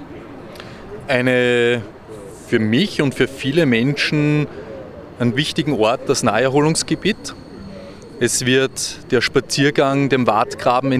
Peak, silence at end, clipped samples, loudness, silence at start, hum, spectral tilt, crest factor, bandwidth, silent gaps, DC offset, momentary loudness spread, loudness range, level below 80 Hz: 0 dBFS; 0 s; under 0.1%; -17 LUFS; 0 s; none; -4.5 dB/octave; 18 dB; 15 kHz; none; under 0.1%; 20 LU; 1 LU; -48 dBFS